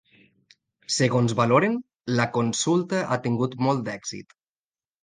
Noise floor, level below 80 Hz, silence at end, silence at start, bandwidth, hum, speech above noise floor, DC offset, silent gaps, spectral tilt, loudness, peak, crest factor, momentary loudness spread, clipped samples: under -90 dBFS; -64 dBFS; 0.8 s; 0.9 s; 10 kHz; none; over 67 dB; under 0.1%; none; -5 dB/octave; -24 LUFS; -6 dBFS; 18 dB; 13 LU; under 0.1%